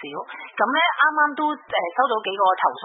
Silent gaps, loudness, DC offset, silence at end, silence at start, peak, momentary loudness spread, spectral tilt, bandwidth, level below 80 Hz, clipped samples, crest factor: none; -20 LUFS; under 0.1%; 0 s; 0 s; -4 dBFS; 12 LU; -7 dB/octave; 4 kHz; -76 dBFS; under 0.1%; 18 dB